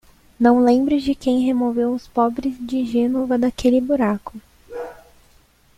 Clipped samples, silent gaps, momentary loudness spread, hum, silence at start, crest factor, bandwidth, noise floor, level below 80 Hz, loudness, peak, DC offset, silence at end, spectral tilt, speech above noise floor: under 0.1%; none; 18 LU; none; 0.4 s; 18 dB; 12 kHz; -54 dBFS; -48 dBFS; -19 LUFS; -2 dBFS; under 0.1%; 0.85 s; -6.5 dB/octave; 36 dB